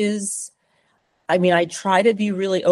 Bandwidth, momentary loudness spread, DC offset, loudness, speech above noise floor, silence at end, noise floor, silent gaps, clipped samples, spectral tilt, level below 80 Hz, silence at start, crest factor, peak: 12.5 kHz; 13 LU; under 0.1%; -20 LUFS; 46 dB; 0 s; -65 dBFS; none; under 0.1%; -4.5 dB/octave; -68 dBFS; 0 s; 18 dB; -2 dBFS